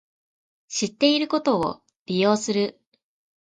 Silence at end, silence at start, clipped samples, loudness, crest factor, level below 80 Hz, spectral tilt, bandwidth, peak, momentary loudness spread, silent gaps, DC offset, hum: 0.7 s; 0.7 s; under 0.1%; -23 LUFS; 20 dB; -64 dBFS; -4 dB/octave; 9.6 kHz; -6 dBFS; 9 LU; 1.96-2.06 s; under 0.1%; none